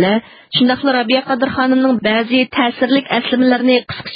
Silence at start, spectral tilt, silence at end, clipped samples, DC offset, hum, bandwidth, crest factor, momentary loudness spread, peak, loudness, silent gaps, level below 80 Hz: 0 s; -10.5 dB/octave; 0 s; under 0.1%; under 0.1%; none; 5.2 kHz; 14 dB; 3 LU; 0 dBFS; -14 LUFS; none; -52 dBFS